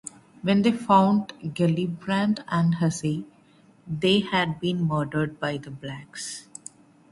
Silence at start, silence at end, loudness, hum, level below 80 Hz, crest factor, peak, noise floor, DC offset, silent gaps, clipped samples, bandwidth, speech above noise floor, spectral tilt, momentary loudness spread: 0.05 s; 0.7 s; -24 LUFS; none; -60 dBFS; 20 dB; -6 dBFS; -56 dBFS; under 0.1%; none; under 0.1%; 11.5 kHz; 32 dB; -6 dB/octave; 17 LU